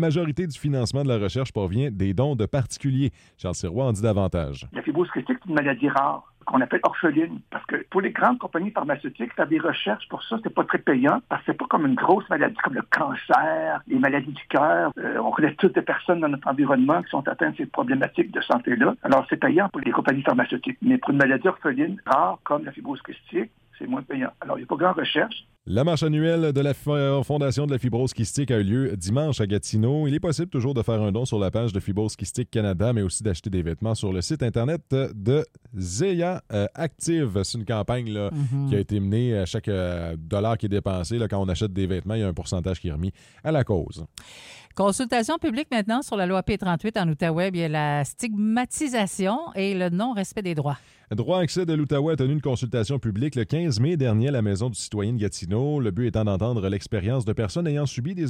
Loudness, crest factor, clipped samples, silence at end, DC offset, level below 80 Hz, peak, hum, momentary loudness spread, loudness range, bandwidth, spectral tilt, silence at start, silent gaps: -24 LUFS; 18 dB; under 0.1%; 0 s; under 0.1%; -48 dBFS; -6 dBFS; none; 7 LU; 4 LU; 14.5 kHz; -6 dB/octave; 0 s; none